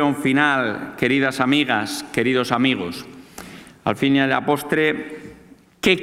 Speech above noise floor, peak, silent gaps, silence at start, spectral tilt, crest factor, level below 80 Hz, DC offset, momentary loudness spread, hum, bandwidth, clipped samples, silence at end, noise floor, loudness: 28 dB; 0 dBFS; none; 0 s; -5 dB/octave; 20 dB; -56 dBFS; under 0.1%; 19 LU; none; 16 kHz; under 0.1%; 0 s; -48 dBFS; -20 LUFS